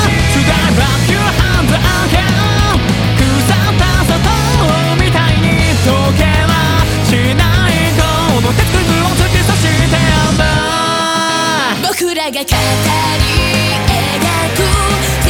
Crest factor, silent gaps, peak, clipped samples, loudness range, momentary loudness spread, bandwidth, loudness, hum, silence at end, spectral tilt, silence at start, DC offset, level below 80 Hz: 10 dB; none; 0 dBFS; under 0.1%; 1 LU; 2 LU; 18.5 kHz; -11 LUFS; none; 0 s; -4.5 dB/octave; 0 s; under 0.1%; -20 dBFS